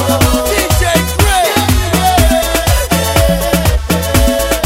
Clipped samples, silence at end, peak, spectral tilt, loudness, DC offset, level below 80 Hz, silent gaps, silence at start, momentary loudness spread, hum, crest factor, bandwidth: under 0.1%; 0 s; 0 dBFS; -4 dB/octave; -11 LUFS; under 0.1%; -18 dBFS; none; 0 s; 2 LU; none; 10 dB; 16.5 kHz